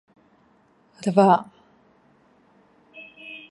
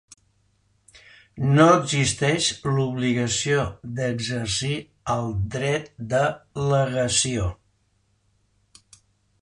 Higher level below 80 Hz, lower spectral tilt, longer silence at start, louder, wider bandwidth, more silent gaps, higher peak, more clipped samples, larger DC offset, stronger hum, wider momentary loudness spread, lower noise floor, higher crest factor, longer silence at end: second, -76 dBFS vs -46 dBFS; first, -7 dB/octave vs -4.5 dB/octave; second, 1.05 s vs 1.35 s; first, -20 LUFS vs -23 LUFS; about the same, 11.5 kHz vs 11 kHz; neither; about the same, -4 dBFS vs -4 dBFS; neither; neither; neither; first, 27 LU vs 11 LU; second, -60 dBFS vs -67 dBFS; about the same, 22 dB vs 20 dB; second, 0.15 s vs 1.85 s